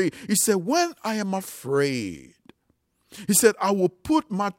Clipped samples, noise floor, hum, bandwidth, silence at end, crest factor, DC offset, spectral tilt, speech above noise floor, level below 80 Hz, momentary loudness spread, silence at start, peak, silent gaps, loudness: under 0.1%; -70 dBFS; none; 16.5 kHz; 0.05 s; 20 dB; under 0.1%; -4 dB/octave; 46 dB; -60 dBFS; 12 LU; 0 s; -4 dBFS; none; -23 LUFS